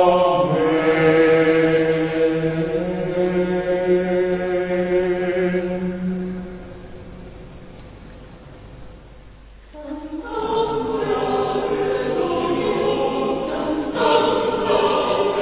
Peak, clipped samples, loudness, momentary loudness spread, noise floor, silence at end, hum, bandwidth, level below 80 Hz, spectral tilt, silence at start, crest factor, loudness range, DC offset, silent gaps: -4 dBFS; under 0.1%; -20 LUFS; 19 LU; -42 dBFS; 0 s; none; 4 kHz; -44 dBFS; -10.5 dB/octave; 0 s; 16 dB; 17 LU; under 0.1%; none